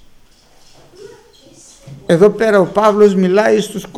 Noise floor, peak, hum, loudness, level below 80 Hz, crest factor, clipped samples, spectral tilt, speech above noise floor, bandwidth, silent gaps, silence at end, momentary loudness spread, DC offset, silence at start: -45 dBFS; 0 dBFS; none; -12 LUFS; -50 dBFS; 14 dB; under 0.1%; -6 dB/octave; 34 dB; 13.5 kHz; none; 0 s; 6 LU; under 0.1%; 1 s